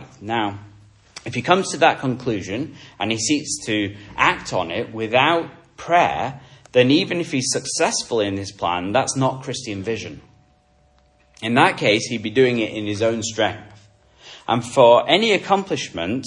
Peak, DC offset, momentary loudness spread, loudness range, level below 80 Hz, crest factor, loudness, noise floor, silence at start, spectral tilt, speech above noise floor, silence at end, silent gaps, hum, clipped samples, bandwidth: 0 dBFS; under 0.1%; 12 LU; 4 LU; -56 dBFS; 20 dB; -20 LUFS; -58 dBFS; 0 s; -4 dB/octave; 38 dB; 0 s; none; none; under 0.1%; 11.5 kHz